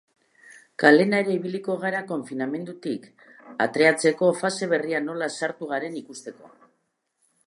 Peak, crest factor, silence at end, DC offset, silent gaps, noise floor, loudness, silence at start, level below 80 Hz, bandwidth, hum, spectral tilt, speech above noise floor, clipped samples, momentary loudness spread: -2 dBFS; 24 dB; 1 s; under 0.1%; none; -74 dBFS; -24 LUFS; 0.8 s; -78 dBFS; 11.5 kHz; none; -5 dB/octave; 51 dB; under 0.1%; 17 LU